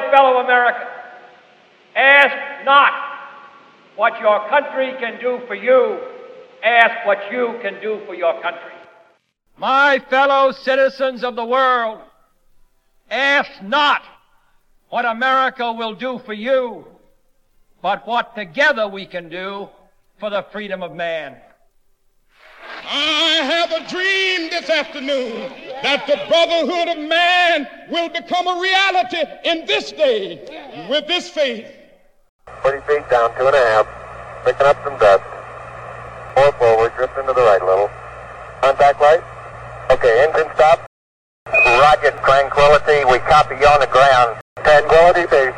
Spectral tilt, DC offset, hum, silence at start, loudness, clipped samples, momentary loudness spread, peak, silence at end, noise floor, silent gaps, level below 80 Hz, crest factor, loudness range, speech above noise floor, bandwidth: -3.5 dB/octave; under 0.1%; none; 0 s; -15 LUFS; under 0.1%; 17 LU; 0 dBFS; 0 s; -59 dBFS; 32.29-32.39 s, 40.87-41.46 s, 44.41-44.56 s; -44 dBFS; 16 dB; 8 LU; 43 dB; 10.5 kHz